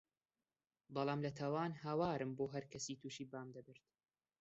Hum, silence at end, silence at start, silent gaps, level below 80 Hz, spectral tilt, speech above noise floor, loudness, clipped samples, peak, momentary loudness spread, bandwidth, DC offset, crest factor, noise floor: none; 0.7 s; 0.9 s; none; -78 dBFS; -5.5 dB/octave; over 47 dB; -44 LUFS; under 0.1%; -26 dBFS; 11 LU; 8 kHz; under 0.1%; 18 dB; under -90 dBFS